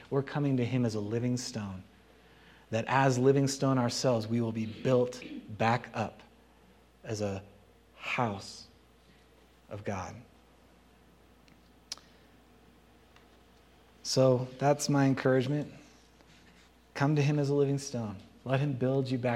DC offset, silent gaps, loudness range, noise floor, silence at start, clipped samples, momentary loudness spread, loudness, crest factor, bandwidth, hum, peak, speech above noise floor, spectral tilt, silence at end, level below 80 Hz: under 0.1%; none; 17 LU; -61 dBFS; 0 s; under 0.1%; 18 LU; -30 LUFS; 20 dB; 14 kHz; none; -12 dBFS; 31 dB; -6 dB/octave; 0 s; -66 dBFS